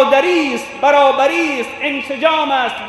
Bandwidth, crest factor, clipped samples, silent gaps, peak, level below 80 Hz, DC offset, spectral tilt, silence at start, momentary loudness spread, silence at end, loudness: 12 kHz; 14 dB; under 0.1%; none; 0 dBFS; -58 dBFS; under 0.1%; -3 dB/octave; 0 s; 8 LU; 0 s; -14 LUFS